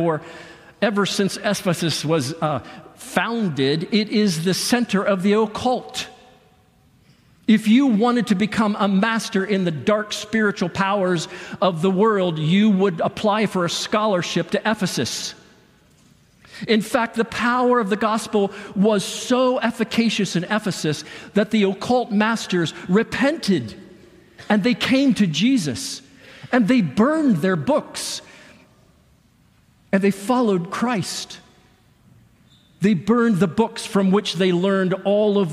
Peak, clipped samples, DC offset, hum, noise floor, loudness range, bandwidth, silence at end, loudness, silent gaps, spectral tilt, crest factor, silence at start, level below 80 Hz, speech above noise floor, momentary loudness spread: -4 dBFS; under 0.1%; under 0.1%; none; -57 dBFS; 4 LU; 15 kHz; 0 s; -20 LUFS; none; -5 dB/octave; 16 dB; 0 s; -60 dBFS; 37 dB; 8 LU